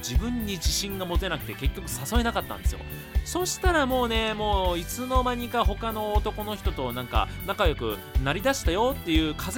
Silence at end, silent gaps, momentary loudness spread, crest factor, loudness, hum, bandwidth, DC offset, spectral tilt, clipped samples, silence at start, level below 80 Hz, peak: 0 s; none; 7 LU; 18 dB; -27 LUFS; none; 17.5 kHz; under 0.1%; -4.5 dB/octave; under 0.1%; 0 s; -30 dBFS; -8 dBFS